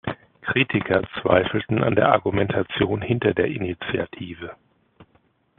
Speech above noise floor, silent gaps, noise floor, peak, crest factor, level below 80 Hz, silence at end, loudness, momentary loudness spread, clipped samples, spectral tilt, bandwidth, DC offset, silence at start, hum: 41 dB; none; -63 dBFS; 0 dBFS; 22 dB; -52 dBFS; 0.55 s; -22 LUFS; 14 LU; under 0.1%; -4.5 dB/octave; 4.3 kHz; under 0.1%; 0.05 s; none